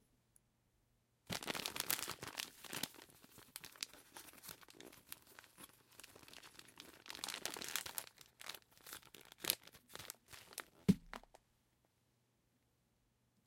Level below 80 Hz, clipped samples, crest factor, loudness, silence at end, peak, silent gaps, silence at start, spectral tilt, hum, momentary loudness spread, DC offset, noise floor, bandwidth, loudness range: -74 dBFS; under 0.1%; 40 dB; -45 LUFS; 2.25 s; -10 dBFS; none; 1.3 s; -3 dB/octave; none; 19 LU; under 0.1%; -80 dBFS; 17 kHz; 10 LU